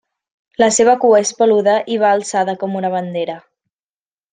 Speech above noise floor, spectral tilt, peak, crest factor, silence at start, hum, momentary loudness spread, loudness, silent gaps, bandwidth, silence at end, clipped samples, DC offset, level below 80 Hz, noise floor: over 76 dB; -3.5 dB/octave; -2 dBFS; 14 dB; 0.6 s; none; 12 LU; -15 LUFS; none; 9.8 kHz; 0.95 s; under 0.1%; under 0.1%; -64 dBFS; under -90 dBFS